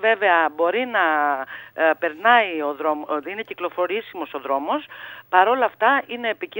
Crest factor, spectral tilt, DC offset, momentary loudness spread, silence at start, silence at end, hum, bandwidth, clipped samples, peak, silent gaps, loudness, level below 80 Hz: 20 dB; -5.5 dB/octave; under 0.1%; 12 LU; 0 s; 0 s; none; 16.5 kHz; under 0.1%; 0 dBFS; none; -21 LUFS; -76 dBFS